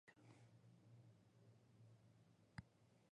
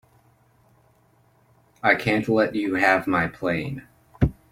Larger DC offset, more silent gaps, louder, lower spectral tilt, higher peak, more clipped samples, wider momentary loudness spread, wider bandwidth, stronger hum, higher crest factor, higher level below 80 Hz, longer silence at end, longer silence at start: neither; neither; second, -66 LUFS vs -22 LUFS; about the same, -6 dB/octave vs -7 dB/octave; second, -40 dBFS vs -4 dBFS; neither; about the same, 7 LU vs 8 LU; second, 10 kHz vs 16.5 kHz; neither; first, 28 dB vs 22 dB; second, -82 dBFS vs -44 dBFS; second, 0 s vs 0.2 s; second, 0.05 s vs 1.85 s